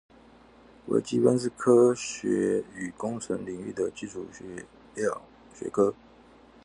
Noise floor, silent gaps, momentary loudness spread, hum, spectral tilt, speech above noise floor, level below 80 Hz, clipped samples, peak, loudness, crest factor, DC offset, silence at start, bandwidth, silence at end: -54 dBFS; none; 19 LU; none; -5.5 dB/octave; 28 dB; -64 dBFS; under 0.1%; -8 dBFS; -27 LUFS; 20 dB; under 0.1%; 0.85 s; 11 kHz; 0.7 s